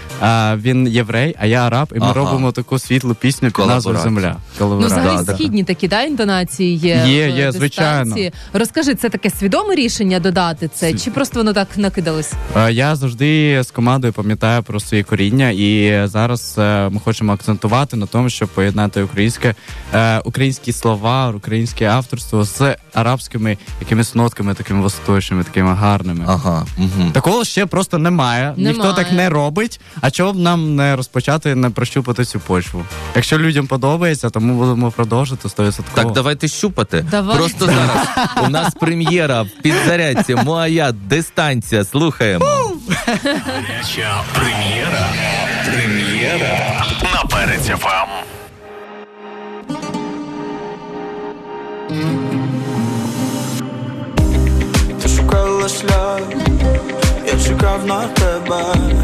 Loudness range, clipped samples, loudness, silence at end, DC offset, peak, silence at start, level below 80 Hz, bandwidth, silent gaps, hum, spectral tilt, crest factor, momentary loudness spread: 3 LU; under 0.1%; -16 LUFS; 0 s; under 0.1%; -4 dBFS; 0 s; -28 dBFS; 14 kHz; none; none; -5.5 dB/octave; 12 dB; 6 LU